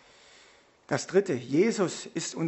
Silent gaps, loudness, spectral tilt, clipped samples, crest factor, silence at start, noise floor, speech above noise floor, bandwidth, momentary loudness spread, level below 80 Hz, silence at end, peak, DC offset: none; -28 LUFS; -5 dB/octave; under 0.1%; 20 dB; 0.9 s; -59 dBFS; 31 dB; 8.4 kHz; 8 LU; -74 dBFS; 0 s; -10 dBFS; under 0.1%